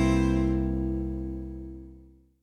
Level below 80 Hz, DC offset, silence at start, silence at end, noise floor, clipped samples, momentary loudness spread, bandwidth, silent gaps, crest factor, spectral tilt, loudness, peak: -34 dBFS; under 0.1%; 0 s; 0.35 s; -53 dBFS; under 0.1%; 20 LU; 10 kHz; none; 16 dB; -7.5 dB/octave; -29 LUFS; -12 dBFS